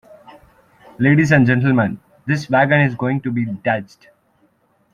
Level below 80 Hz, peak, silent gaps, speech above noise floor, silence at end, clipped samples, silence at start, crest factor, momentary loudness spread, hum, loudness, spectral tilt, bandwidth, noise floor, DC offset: -54 dBFS; -2 dBFS; none; 44 dB; 1.1 s; under 0.1%; 1 s; 16 dB; 10 LU; none; -17 LUFS; -7.5 dB/octave; 9.8 kHz; -60 dBFS; under 0.1%